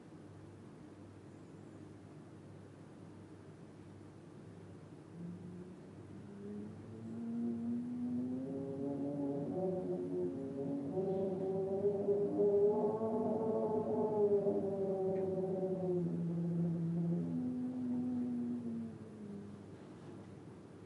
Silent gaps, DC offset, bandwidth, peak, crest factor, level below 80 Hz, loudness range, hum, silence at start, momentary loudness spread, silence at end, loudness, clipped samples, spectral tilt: none; under 0.1%; 11 kHz; -22 dBFS; 18 dB; -78 dBFS; 20 LU; none; 0 s; 21 LU; 0 s; -38 LUFS; under 0.1%; -10 dB/octave